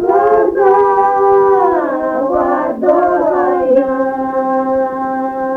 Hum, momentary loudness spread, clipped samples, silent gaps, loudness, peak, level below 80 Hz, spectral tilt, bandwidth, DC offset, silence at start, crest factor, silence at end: none; 6 LU; under 0.1%; none; -13 LUFS; 0 dBFS; -46 dBFS; -8 dB/octave; 4 kHz; under 0.1%; 0 s; 12 dB; 0 s